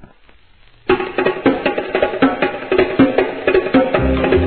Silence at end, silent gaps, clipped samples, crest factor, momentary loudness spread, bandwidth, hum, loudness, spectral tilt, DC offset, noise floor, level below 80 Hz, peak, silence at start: 0 s; none; under 0.1%; 16 dB; 5 LU; 4.5 kHz; none; -16 LUFS; -10 dB/octave; 0.3%; -49 dBFS; -32 dBFS; 0 dBFS; 0.85 s